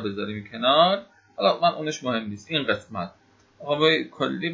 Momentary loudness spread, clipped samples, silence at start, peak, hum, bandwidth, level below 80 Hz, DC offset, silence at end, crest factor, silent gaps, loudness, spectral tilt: 15 LU; under 0.1%; 0 s; -6 dBFS; none; 7.8 kHz; -62 dBFS; under 0.1%; 0 s; 20 dB; none; -23 LUFS; -4.5 dB/octave